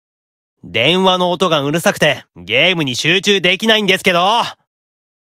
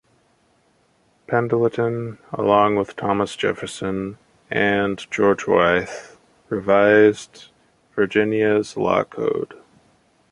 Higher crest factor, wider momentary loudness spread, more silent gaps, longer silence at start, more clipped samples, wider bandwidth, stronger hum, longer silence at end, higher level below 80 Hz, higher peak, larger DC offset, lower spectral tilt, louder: about the same, 16 dB vs 20 dB; second, 6 LU vs 13 LU; neither; second, 0.65 s vs 1.3 s; neither; first, 16.5 kHz vs 11.5 kHz; neither; about the same, 0.8 s vs 0.8 s; about the same, -56 dBFS vs -54 dBFS; about the same, 0 dBFS vs -2 dBFS; neither; second, -3.5 dB/octave vs -6 dB/octave; first, -13 LUFS vs -20 LUFS